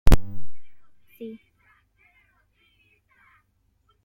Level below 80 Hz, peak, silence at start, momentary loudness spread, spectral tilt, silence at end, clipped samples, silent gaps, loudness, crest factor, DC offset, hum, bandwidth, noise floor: -28 dBFS; -2 dBFS; 0.05 s; 24 LU; -6.5 dB/octave; 2.75 s; under 0.1%; none; -30 LUFS; 20 dB; under 0.1%; none; 16.5 kHz; -68 dBFS